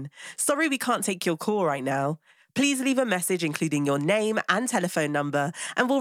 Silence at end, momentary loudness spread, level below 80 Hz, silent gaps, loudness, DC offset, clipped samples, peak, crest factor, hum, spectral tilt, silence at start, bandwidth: 0 s; 4 LU; -80 dBFS; none; -25 LUFS; under 0.1%; under 0.1%; -4 dBFS; 20 dB; none; -4 dB/octave; 0 s; 17 kHz